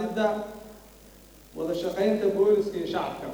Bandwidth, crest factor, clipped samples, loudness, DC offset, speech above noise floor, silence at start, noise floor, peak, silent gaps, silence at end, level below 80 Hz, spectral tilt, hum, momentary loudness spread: over 20 kHz; 16 dB; under 0.1%; -26 LUFS; under 0.1%; 25 dB; 0 s; -51 dBFS; -12 dBFS; none; 0 s; -56 dBFS; -6 dB/octave; none; 20 LU